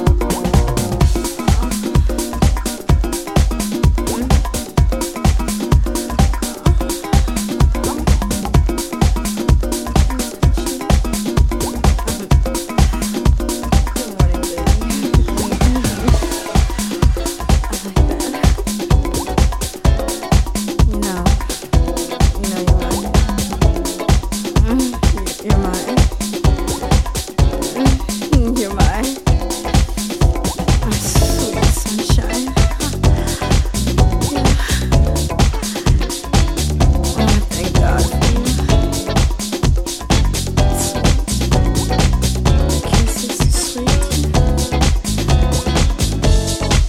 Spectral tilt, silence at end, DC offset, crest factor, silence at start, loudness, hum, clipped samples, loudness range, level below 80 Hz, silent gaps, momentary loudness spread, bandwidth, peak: -5 dB/octave; 0 s; under 0.1%; 14 dB; 0 s; -17 LUFS; none; under 0.1%; 1 LU; -18 dBFS; none; 3 LU; 16.5 kHz; 0 dBFS